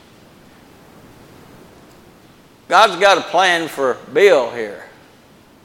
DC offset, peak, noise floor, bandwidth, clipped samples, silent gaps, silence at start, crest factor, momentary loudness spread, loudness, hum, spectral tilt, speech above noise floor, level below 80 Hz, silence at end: under 0.1%; 0 dBFS; -47 dBFS; 17 kHz; under 0.1%; none; 2.7 s; 18 dB; 15 LU; -14 LUFS; none; -2.5 dB/octave; 33 dB; -60 dBFS; 0.8 s